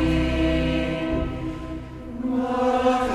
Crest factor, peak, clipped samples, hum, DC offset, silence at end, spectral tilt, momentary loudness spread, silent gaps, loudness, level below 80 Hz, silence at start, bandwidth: 14 dB; -10 dBFS; under 0.1%; none; under 0.1%; 0 s; -7 dB/octave; 13 LU; none; -24 LUFS; -32 dBFS; 0 s; 12 kHz